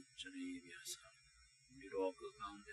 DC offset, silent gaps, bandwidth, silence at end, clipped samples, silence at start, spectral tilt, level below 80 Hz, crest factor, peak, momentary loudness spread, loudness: under 0.1%; none; 11.5 kHz; 0 s; under 0.1%; 0 s; -2.5 dB/octave; -76 dBFS; 20 dB; -30 dBFS; 22 LU; -48 LUFS